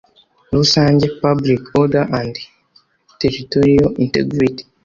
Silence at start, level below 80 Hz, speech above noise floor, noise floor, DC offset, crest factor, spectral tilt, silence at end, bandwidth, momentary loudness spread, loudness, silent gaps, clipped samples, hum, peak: 0.5 s; -42 dBFS; 41 dB; -55 dBFS; under 0.1%; 14 dB; -6 dB/octave; 0.25 s; 7.4 kHz; 8 LU; -15 LUFS; none; under 0.1%; none; -2 dBFS